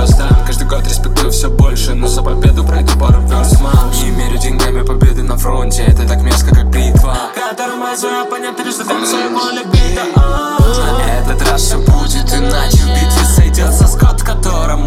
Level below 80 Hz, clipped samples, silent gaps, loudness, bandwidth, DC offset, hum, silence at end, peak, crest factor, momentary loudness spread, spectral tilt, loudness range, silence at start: -12 dBFS; under 0.1%; none; -12 LUFS; 16 kHz; under 0.1%; none; 0 s; 0 dBFS; 10 dB; 6 LU; -5 dB/octave; 3 LU; 0 s